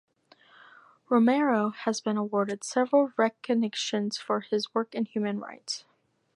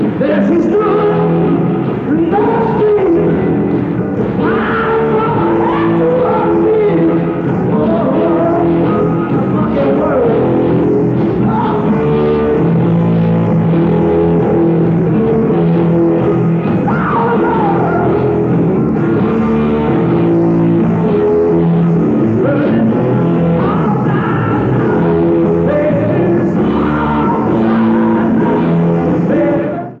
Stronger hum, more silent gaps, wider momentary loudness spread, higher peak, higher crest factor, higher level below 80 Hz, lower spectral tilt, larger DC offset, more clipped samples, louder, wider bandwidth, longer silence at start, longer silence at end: neither; neither; first, 9 LU vs 2 LU; second, -10 dBFS vs -2 dBFS; first, 18 dB vs 10 dB; second, -82 dBFS vs -36 dBFS; second, -4.5 dB/octave vs -10.5 dB/octave; neither; neither; second, -28 LUFS vs -12 LUFS; first, 11.5 kHz vs 4.5 kHz; first, 1.1 s vs 0 s; first, 0.55 s vs 0 s